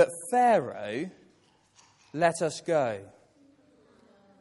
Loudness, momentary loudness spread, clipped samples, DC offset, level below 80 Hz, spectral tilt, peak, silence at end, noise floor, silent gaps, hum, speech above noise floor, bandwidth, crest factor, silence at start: -27 LUFS; 17 LU; under 0.1%; under 0.1%; -76 dBFS; -4.5 dB/octave; -10 dBFS; 1.35 s; -64 dBFS; none; none; 37 dB; 11.5 kHz; 20 dB; 0 s